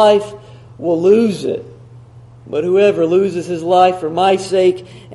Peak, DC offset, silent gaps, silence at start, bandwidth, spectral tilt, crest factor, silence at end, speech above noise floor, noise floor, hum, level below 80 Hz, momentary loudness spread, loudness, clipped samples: 0 dBFS; under 0.1%; none; 0 s; 11.5 kHz; -6 dB/octave; 14 dB; 0 s; 26 dB; -39 dBFS; none; -56 dBFS; 12 LU; -14 LUFS; under 0.1%